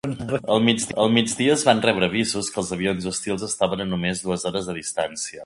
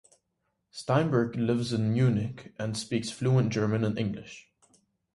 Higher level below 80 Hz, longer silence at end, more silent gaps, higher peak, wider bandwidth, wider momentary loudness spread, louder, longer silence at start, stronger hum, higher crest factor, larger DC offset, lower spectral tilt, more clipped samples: first, -52 dBFS vs -60 dBFS; second, 0 s vs 0.75 s; neither; first, 0 dBFS vs -12 dBFS; about the same, 11.5 kHz vs 11.5 kHz; second, 8 LU vs 14 LU; first, -22 LUFS vs -28 LUFS; second, 0.05 s vs 0.75 s; neither; about the same, 22 dB vs 18 dB; neither; second, -4 dB/octave vs -6.5 dB/octave; neither